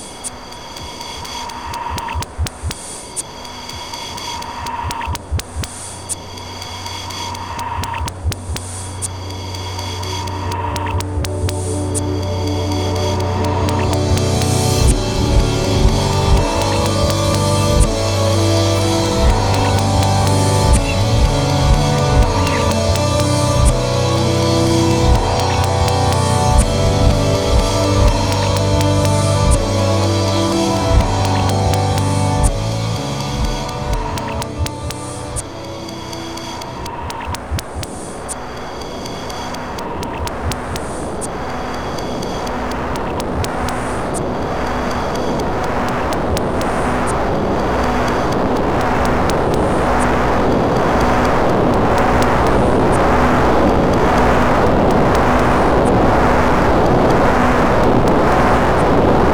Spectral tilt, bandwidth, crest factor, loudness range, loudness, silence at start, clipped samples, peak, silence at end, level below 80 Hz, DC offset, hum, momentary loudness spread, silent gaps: -5.5 dB/octave; over 20 kHz; 16 dB; 11 LU; -17 LUFS; 0 s; under 0.1%; 0 dBFS; 0 s; -24 dBFS; under 0.1%; none; 12 LU; none